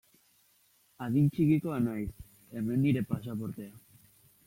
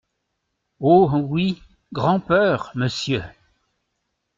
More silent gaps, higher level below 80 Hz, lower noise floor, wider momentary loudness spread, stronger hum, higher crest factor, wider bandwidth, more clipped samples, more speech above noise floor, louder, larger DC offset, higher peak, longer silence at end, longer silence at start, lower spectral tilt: neither; second, -58 dBFS vs -52 dBFS; second, -68 dBFS vs -76 dBFS; first, 16 LU vs 13 LU; neither; about the same, 16 dB vs 18 dB; first, 16.5 kHz vs 7.6 kHz; neither; second, 38 dB vs 57 dB; second, -31 LUFS vs -20 LUFS; neither; second, -16 dBFS vs -4 dBFS; second, 0.7 s vs 1.1 s; first, 1 s vs 0.8 s; first, -8.5 dB/octave vs -6.5 dB/octave